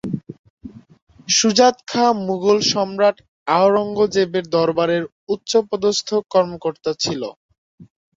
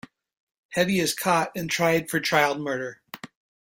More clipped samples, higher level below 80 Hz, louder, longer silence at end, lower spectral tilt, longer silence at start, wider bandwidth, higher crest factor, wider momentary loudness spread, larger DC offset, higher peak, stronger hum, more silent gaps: neither; about the same, -58 dBFS vs -62 dBFS; first, -18 LUFS vs -24 LUFS; about the same, 0.35 s vs 0.45 s; about the same, -3.5 dB/octave vs -4 dB/octave; second, 0.05 s vs 0.7 s; second, 7.8 kHz vs 16.5 kHz; about the same, 18 dB vs 20 dB; second, 12 LU vs 16 LU; neither; first, -2 dBFS vs -6 dBFS; neither; first, 0.39-0.44 s, 0.50-0.57 s, 1.02-1.07 s, 3.28-3.46 s, 5.12-5.27 s, 7.36-7.49 s, 7.58-7.78 s vs none